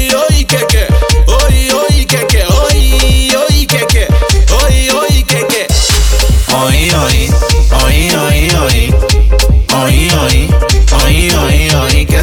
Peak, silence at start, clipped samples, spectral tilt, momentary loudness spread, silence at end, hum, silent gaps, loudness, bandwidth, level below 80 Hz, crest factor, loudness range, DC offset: 0 dBFS; 0 s; under 0.1%; -4 dB/octave; 1 LU; 0 s; none; none; -9 LUFS; 17.5 kHz; -10 dBFS; 8 dB; 0 LU; under 0.1%